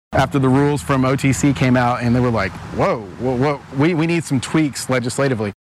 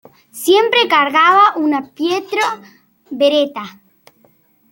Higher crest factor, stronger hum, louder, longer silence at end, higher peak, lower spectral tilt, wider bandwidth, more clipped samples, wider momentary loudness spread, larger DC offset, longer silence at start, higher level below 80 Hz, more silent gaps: about the same, 14 dB vs 14 dB; neither; second, -18 LUFS vs -14 LUFS; second, 0.1 s vs 1 s; about the same, -2 dBFS vs -2 dBFS; first, -6 dB/octave vs -2.5 dB/octave; second, 13.5 kHz vs 17 kHz; neither; second, 5 LU vs 17 LU; neither; second, 0.1 s vs 0.35 s; first, -40 dBFS vs -68 dBFS; neither